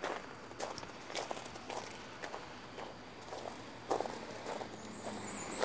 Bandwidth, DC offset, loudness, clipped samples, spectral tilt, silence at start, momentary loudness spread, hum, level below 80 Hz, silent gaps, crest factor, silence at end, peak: 8 kHz; under 0.1%; -44 LUFS; under 0.1%; -3.5 dB/octave; 0 s; 8 LU; none; -68 dBFS; none; 26 dB; 0 s; -18 dBFS